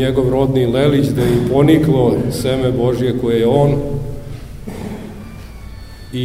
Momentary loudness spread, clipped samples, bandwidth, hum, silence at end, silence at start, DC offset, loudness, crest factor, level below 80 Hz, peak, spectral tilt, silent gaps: 21 LU; under 0.1%; 16 kHz; none; 0 s; 0 s; 0.4%; -15 LUFS; 16 dB; -32 dBFS; 0 dBFS; -7.5 dB/octave; none